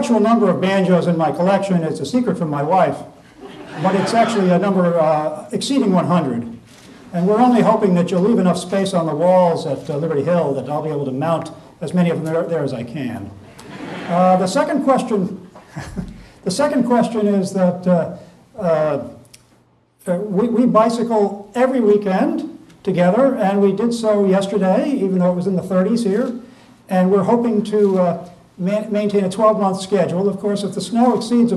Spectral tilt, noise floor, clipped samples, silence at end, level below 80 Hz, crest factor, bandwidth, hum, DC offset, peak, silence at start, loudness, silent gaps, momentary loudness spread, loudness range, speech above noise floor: -7 dB/octave; -55 dBFS; under 0.1%; 0 s; -54 dBFS; 16 dB; 12.5 kHz; none; under 0.1%; -2 dBFS; 0 s; -17 LUFS; none; 13 LU; 4 LU; 39 dB